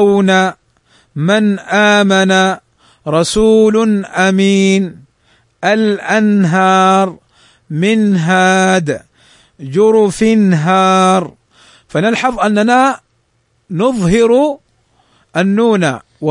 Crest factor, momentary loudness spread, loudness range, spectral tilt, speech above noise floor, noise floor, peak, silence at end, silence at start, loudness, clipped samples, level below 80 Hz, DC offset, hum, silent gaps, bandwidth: 12 dB; 11 LU; 3 LU; -5.5 dB/octave; 49 dB; -59 dBFS; 0 dBFS; 0 s; 0 s; -12 LUFS; under 0.1%; -44 dBFS; under 0.1%; none; none; 11 kHz